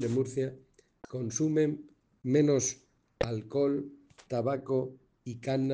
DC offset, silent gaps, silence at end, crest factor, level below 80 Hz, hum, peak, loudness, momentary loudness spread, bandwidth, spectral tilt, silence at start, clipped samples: under 0.1%; none; 0 s; 18 dB; -60 dBFS; none; -14 dBFS; -31 LUFS; 15 LU; 10 kHz; -6 dB/octave; 0 s; under 0.1%